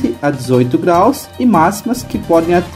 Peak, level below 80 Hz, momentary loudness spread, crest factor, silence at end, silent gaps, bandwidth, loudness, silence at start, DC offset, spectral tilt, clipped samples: 0 dBFS; -40 dBFS; 8 LU; 12 dB; 0 s; none; 16 kHz; -13 LUFS; 0 s; under 0.1%; -6.5 dB/octave; under 0.1%